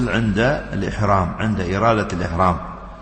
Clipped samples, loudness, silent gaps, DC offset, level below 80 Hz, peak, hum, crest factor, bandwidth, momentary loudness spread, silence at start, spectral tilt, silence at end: under 0.1%; -20 LUFS; none; under 0.1%; -34 dBFS; -4 dBFS; none; 16 dB; 8.8 kHz; 6 LU; 0 s; -7 dB/octave; 0 s